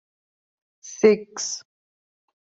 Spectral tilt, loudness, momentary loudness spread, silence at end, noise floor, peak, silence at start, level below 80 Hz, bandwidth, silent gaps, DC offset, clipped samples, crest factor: -3.5 dB/octave; -22 LUFS; 16 LU; 0.95 s; under -90 dBFS; -4 dBFS; 0.85 s; -74 dBFS; 8 kHz; none; under 0.1%; under 0.1%; 22 dB